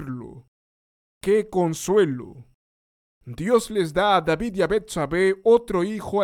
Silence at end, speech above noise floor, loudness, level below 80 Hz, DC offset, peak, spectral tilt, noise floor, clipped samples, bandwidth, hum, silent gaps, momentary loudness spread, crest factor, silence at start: 0 s; over 69 dB; -22 LUFS; -50 dBFS; under 0.1%; -6 dBFS; -5.5 dB/octave; under -90 dBFS; under 0.1%; 16.5 kHz; none; 0.48-1.21 s, 2.55-3.21 s; 15 LU; 18 dB; 0 s